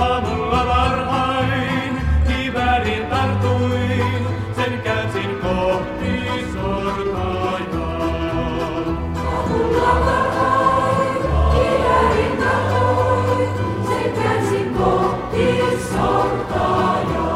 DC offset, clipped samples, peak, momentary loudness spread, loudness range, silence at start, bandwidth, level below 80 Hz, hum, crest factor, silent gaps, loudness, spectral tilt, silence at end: under 0.1%; under 0.1%; -4 dBFS; 6 LU; 5 LU; 0 s; 14 kHz; -28 dBFS; none; 14 dB; none; -19 LUFS; -6.5 dB/octave; 0 s